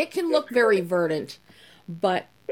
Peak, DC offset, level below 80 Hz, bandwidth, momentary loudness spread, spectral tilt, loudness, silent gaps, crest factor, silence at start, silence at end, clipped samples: -8 dBFS; under 0.1%; -72 dBFS; 17 kHz; 19 LU; -5.5 dB/octave; -24 LUFS; none; 18 dB; 0 s; 0 s; under 0.1%